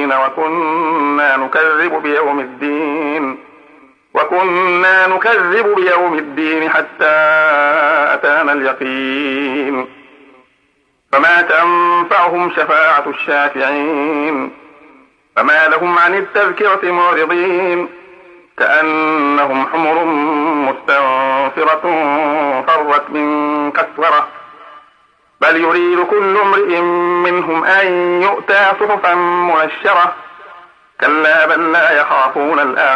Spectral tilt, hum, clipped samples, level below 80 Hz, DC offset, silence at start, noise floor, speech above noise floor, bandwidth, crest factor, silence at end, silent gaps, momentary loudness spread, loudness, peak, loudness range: -5.5 dB/octave; none; under 0.1%; -68 dBFS; under 0.1%; 0 s; -59 dBFS; 46 dB; 9.8 kHz; 14 dB; 0 s; none; 7 LU; -12 LUFS; 0 dBFS; 3 LU